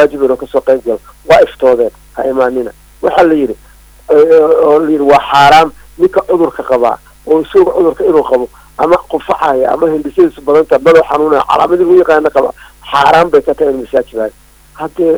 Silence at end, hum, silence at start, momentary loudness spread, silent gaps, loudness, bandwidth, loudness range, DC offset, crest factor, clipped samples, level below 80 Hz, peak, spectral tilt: 0 s; none; 0 s; 11 LU; none; -10 LUFS; over 20 kHz; 3 LU; under 0.1%; 10 dB; 0.1%; -40 dBFS; 0 dBFS; -5.5 dB/octave